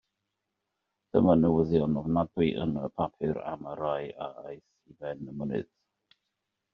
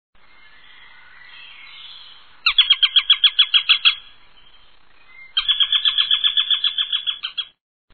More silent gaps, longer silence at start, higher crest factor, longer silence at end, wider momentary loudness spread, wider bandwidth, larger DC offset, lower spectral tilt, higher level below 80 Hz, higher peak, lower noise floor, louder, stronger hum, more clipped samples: neither; second, 1.15 s vs 1.35 s; about the same, 22 dB vs 18 dB; first, 1.1 s vs 0.5 s; about the same, 17 LU vs 19 LU; second, 5.4 kHz vs 7.2 kHz; second, under 0.1% vs 0.5%; first, -7.5 dB/octave vs 1 dB/octave; about the same, -58 dBFS vs -58 dBFS; second, -8 dBFS vs -2 dBFS; first, -84 dBFS vs -54 dBFS; second, -29 LUFS vs -15 LUFS; neither; neither